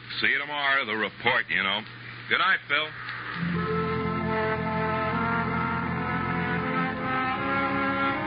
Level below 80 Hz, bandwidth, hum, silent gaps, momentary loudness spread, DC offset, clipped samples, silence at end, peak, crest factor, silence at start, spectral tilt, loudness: -54 dBFS; 5.2 kHz; none; none; 5 LU; under 0.1%; under 0.1%; 0 s; -8 dBFS; 20 dB; 0 s; -3 dB/octave; -26 LUFS